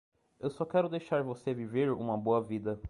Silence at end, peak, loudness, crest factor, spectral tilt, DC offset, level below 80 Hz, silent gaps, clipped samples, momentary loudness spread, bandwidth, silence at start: 0 s; -16 dBFS; -33 LUFS; 16 dB; -8 dB/octave; under 0.1%; -58 dBFS; none; under 0.1%; 6 LU; 11 kHz; 0.4 s